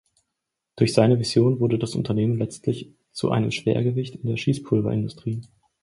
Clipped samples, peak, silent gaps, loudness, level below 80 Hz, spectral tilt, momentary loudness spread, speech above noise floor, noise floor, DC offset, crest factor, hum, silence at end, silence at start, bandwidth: under 0.1%; -2 dBFS; none; -23 LUFS; -54 dBFS; -7 dB/octave; 11 LU; 60 dB; -82 dBFS; under 0.1%; 20 dB; none; 0.4 s; 0.75 s; 11.5 kHz